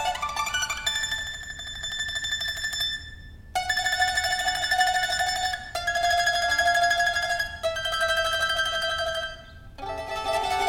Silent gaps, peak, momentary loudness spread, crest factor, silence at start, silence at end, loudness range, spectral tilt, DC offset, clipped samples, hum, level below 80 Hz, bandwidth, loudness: none; -8 dBFS; 11 LU; 18 dB; 0 s; 0 s; 5 LU; -0.5 dB/octave; under 0.1%; under 0.1%; none; -46 dBFS; 17 kHz; -25 LUFS